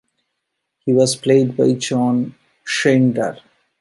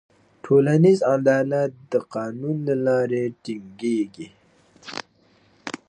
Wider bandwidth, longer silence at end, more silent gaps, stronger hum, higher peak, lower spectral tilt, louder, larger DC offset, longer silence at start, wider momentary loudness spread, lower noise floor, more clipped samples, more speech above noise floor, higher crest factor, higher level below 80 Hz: first, 11.5 kHz vs 10 kHz; first, 0.45 s vs 0.15 s; neither; neither; first, -2 dBFS vs -6 dBFS; second, -5.5 dB/octave vs -7.5 dB/octave; first, -17 LUFS vs -21 LUFS; neither; first, 0.85 s vs 0.45 s; second, 12 LU vs 19 LU; first, -76 dBFS vs -59 dBFS; neither; first, 60 dB vs 38 dB; about the same, 16 dB vs 18 dB; about the same, -64 dBFS vs -68 dBFS